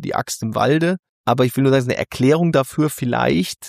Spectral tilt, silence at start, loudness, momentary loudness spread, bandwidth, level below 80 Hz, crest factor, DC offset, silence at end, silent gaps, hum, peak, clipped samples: -6 dB/octave; 0 s; -18 LUFS; 7 LU; 15.5 kHz; -52 dBFS; 16 dB; under 0.1%; 0 s; 0.99-1.03 s, 1.09-1.24 s; none; -2 dBFS; under 0.1%